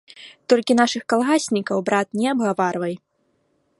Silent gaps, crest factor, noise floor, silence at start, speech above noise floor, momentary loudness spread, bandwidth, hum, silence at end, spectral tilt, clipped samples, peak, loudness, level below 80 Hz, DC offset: none; 18 dB; -67 dBFS; 0.2 s; 47 dB; 10 LU; 11.5 kHz; none; 0.85 s; -4.5 dB/octave; under 0.1%; -2 dBFS; -20 LUFS; -70 dBFS; under 0.1%